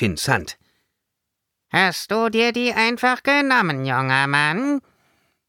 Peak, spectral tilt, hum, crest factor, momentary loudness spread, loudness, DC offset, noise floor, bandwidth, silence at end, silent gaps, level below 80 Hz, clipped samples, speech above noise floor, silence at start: -4 dBFS; -4.5 dB/octave; none; 18 dB; 6 LU; -19 LUFS; under 0.1%; -80 dBFS; 17.5 kHz; 0.7 s; none; -54 dBFS; under 0.1%; 60 dB; 0 s